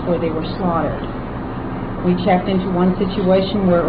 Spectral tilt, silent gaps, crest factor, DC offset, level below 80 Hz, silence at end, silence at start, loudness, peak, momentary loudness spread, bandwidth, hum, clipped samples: -11 dB/octave; none; 14 dB; 0.2%; -34 dBFS; 0 s; 0 s; -19 LUFS; -4 dBFS; 10 LU; 5 kHz; none; under 0.1%